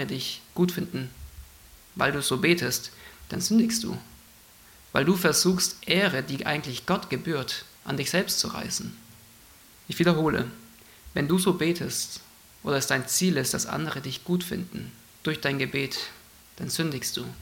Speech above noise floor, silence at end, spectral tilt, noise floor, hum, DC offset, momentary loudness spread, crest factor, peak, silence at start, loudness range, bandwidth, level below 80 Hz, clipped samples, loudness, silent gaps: 26 dB; 0 s; -4 dB/octave; -53 dBFS; none; under 0.1%; 15 LU; 22 dB; -6 dBFS; 0 s; 4 LU; 17 kHz; -56 dBFS; under 0.1%; -26 LUFS; none